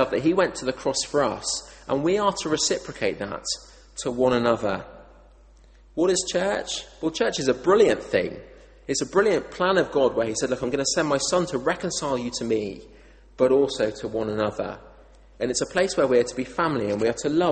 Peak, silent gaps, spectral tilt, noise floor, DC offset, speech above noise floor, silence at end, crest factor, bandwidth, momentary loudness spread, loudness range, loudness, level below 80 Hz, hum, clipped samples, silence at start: -6 dBFS; none; -3.5 dB/octave; -51 dBFS; under 0.1%; 28 dB; 0 s; 18 dB; 8.8 kHz; 10 LU; 3 LU; -24 LUFS; -52 dBFS; none; under 0.1%; 0 s